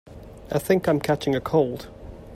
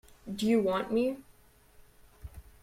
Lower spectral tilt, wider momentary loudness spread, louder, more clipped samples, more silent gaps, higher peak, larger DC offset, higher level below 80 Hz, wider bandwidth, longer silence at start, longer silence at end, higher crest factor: about the same, -6.5 dB/octave vs -6 dB/octave; about the same, 22 LU vs 23 LU; first, -23 LUFS vs -30 LUFS; neither; neither; first, -6 dBFS vs -16 dBFS; neither; first, -48 dBFS vs -56 dBFS; about the same, 16 kHz vs 16 kHz; second, 0.05 s vs 0.25 s; second, 0 s vs 0.2 s; about the same, 18 dB vs 16 dB